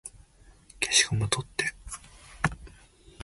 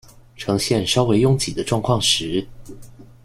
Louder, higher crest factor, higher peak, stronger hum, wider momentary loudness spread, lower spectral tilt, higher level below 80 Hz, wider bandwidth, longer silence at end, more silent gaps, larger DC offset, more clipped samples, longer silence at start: second, -27 LUFS vs -19 LUFS; first, 26 dB vs 18 dB; about the same, -6 dBFS vs -4 dBFS; neither; first, 20 LU vs 10 LU; second, -2 dB/octave vs -4.5 dB/octave; second, -50 dBFS vs -44 dBFS; second, 12 kHz vs 15.5 kHz; second, 0 s vs 0.2 s; neither; neither; neither; second, 0.05 s vs 0.35 s